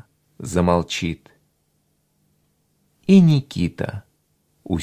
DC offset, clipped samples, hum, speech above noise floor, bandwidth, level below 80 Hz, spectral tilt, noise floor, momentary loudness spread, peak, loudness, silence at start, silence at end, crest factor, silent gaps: under 0.1%; under 0.1%; none; 49 dB; 10.5 kHz; -42 dBFS; -7 dB/octave; -67 dBFS; 21 LU; -2 dBFS; -19 LUFS; 0.4 s; 0 s; 20 dB; none